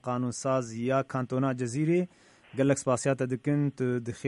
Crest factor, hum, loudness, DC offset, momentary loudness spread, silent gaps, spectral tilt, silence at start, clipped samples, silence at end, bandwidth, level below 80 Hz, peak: 16 dB; none; -29 LUFS; under 0.1%; 4 LU; none; -6.5 dB/octave; 0.05 s; under 0.1%; 0 s; 11.5 kHz; -68 dBFS; -14 dBFS